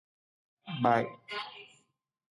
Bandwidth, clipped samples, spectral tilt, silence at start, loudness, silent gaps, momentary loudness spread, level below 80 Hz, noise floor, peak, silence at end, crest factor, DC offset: 11.5 kHz; under 0.1%; -6.5 dB/octave; 0.65 s; -32 LUFS; none; 22 LU; -78 dBFS; -74 dBFS; -12 dBFS; 0.7 s; 22 dB; under 0.1%